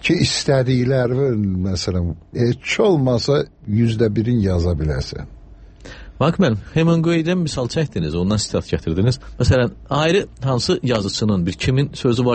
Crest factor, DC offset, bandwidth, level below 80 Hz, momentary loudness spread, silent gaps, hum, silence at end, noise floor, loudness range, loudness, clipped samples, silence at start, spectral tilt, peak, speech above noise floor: 14 dB; under 0.1%; 8.8 kHz; -36 dBFS; 6 LU; none; none; 0 s; -41 dBFS; 2 LU; -19 LUFS; under 0.1%; 0 s; -6 dB/octave; -4 dBFS; 23 dB